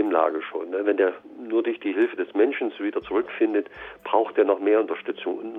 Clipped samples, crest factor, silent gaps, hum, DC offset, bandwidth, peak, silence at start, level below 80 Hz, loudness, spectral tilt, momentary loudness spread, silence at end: under 0.1%; 18 dB; none; none; under 0.1%; 3.9 kHz; -6 dBFS; 0 s; -66 dBFS; -24 LUFS; -7 dB/octave; 8 LU; 0 s